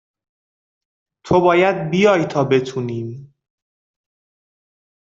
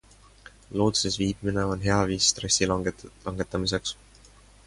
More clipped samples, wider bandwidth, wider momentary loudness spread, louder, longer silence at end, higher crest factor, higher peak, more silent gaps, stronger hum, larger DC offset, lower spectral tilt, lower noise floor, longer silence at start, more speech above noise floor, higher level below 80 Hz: neither; second, 7.6 kHz vs 11.5 kHz; about the same, 12 LU vs 13 LU; first, -17 LUFS vs -26 LUFS; first, 1.8 s vs 0.75 s; about the same, 18 dB vs 20 dB; first, -2 dBFS vs -8 dBFS; neither; neither; neither; first, -6.5 dB/octave vs -3.5 dB/octave; first, under -90 dBFS vs -53 dBFS; first, 1.25 s vs 0.7 s; first, over 74 dB vs 27 dB; second, -56 dBFS vs -46 dBFS